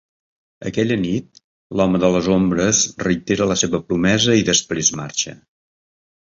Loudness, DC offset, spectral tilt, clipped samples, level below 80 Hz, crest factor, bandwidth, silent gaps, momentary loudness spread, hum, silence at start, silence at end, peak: -18 LUFS; under 0.1%; -3.5 dB/octave; under 0.1%; -46 dBFS; 18 dB; 7.8 kHz; 1.44-1.70 s; 9 LU; none; 0.6 s; 0.95 s; -2 dBFS